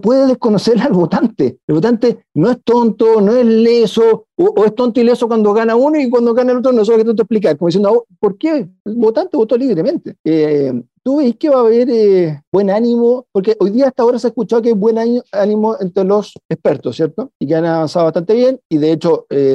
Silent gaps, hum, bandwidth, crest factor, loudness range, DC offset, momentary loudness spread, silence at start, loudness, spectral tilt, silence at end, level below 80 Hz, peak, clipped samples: 1.63-1.68 s, 8.80-8.85 s, 10.20-10.24 s, 12.47-12.52 s, 16.45-16.49 s, 17.35-17.40 s, 18.65-18.70 s; none; 8.6 kHz; 10 dB; 4 LU; under 0.1%; 6 LU; 0.05 s; -13 LUFS; -7.5 dB/octave; 0 s; -58 dBFS; -4 dBFS; under 0.1%